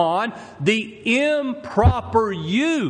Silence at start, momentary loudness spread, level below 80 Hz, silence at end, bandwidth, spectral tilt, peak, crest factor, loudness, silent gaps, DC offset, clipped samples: 0 s; 6 LU; -36 dBFS; 0 s; 10 kHz; -6 dB/octave; -2 dBFS; 18 dB; -21 LUFS; none; under 0.1%; under 0.1%